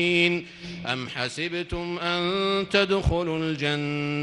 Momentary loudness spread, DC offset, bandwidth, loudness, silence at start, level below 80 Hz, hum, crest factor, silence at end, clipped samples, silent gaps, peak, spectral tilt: 9 LU; under 0.1%; 11.5 kHz; -25 LUFS; 0 s; -42 dBFS; none; 18 dB; 0 s; under 0.1%; none; -8 dBFS; -5.5 dB/octave